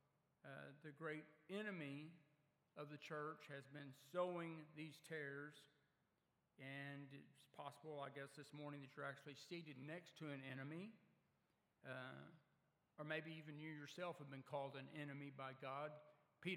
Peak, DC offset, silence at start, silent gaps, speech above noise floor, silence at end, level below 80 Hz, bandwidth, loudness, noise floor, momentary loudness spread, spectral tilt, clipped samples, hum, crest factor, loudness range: -32 dBFS; under 0.1%; 0.45 s; none; 33 dB; 0 s; under -90 dBFS; 16 kHz; -54 LUFS; -87 dBFS; 10 LU; -6 dB/octave; under 0.1%; none; 22 dB; 5 LU